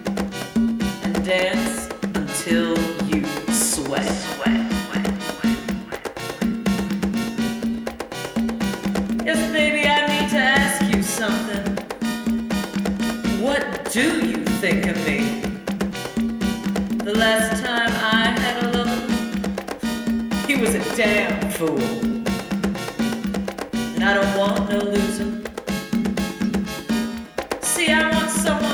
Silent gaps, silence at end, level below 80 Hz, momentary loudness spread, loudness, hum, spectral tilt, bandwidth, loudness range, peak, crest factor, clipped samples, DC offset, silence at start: none; 0 s; -42 dBFS; 9 LU; -21 LUFS; none; -4 dB/octave; 19 kHz; 4 LU; -4 dBFS; 18 dB; under 0.1%; under 0.1%; 0 s